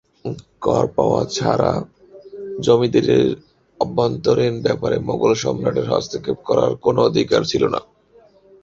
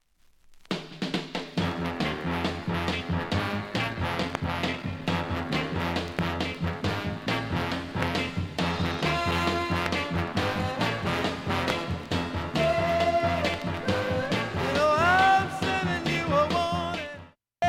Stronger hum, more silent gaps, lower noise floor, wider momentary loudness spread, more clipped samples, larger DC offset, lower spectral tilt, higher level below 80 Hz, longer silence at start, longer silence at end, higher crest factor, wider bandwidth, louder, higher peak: neither; neither; second, -52 dBFS vs -59 dBFS; first, 13 LU vs 6 LU; neither; neither; about the same, -6 dB/octave vs -5.5 dB/octave; about the same, -48 dBFS vs -46 dBFS; second, 0.25 s vs 0.5 s; first, 0.8 s vs 0 s; about the same, 18 dB vs 20 dB; second, 7.6 kHz vs 16 kHz; first, -19 LUFS vs -27 LUFS; first, -2 dBFS vs -8 dBFS